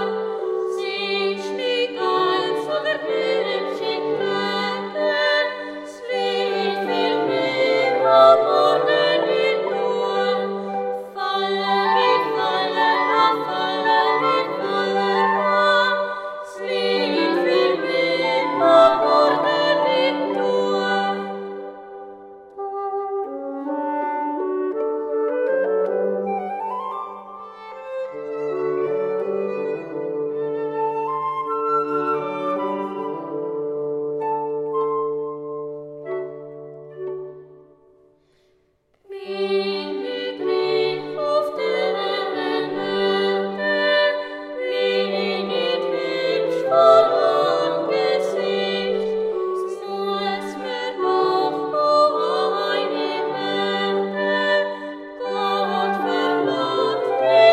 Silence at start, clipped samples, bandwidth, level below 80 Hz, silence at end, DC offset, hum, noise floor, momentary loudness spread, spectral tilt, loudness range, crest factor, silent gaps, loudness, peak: 0 s; under 0.1%; 13 kHz; -70 dBFS; 0 s; under 0.1%; none; -64 dBFS; 12 LU; -5 dB/octave; 9 LU; 20 dB; none; -21 LUFS; -2 dBFS